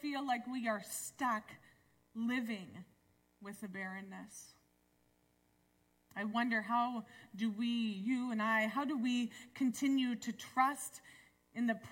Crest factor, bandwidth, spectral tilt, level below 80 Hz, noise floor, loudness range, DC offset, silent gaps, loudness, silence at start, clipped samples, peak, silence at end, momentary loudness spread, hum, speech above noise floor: 20 dB; 16.5 kHz; -4 dB/octave; -82 dBFS; -75 dBFS; 13 LU; under 0.1%; none; -38 LUFS; 0 s; under 0.1%; -18 dBFS; 0 s; 17 LU; 60 Hz at -70 dBFS; 37 dB